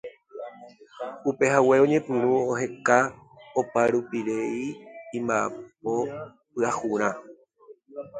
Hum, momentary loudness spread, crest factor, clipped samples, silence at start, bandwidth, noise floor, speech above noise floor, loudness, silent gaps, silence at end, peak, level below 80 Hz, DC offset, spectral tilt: none; 20 LU; 22 dB; under 0.1%; 0.05 s; 9.4 kHz; -53 dBFS; 28 dB; -25 LUFS; none; 0 s; -4 dBFS; -68 dBFS; under 0.1%; -5.5 dB/octave